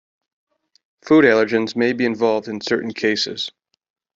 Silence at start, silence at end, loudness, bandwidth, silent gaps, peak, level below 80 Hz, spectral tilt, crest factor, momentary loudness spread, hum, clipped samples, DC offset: 1.05 s; 0.65 s; -18 LUFS; 7.8 kHz; none; -2 dBFS; -62 dBFS; -5 dB/octave; 18 dB; 10 LU; none; under 0.1%; under 0.1%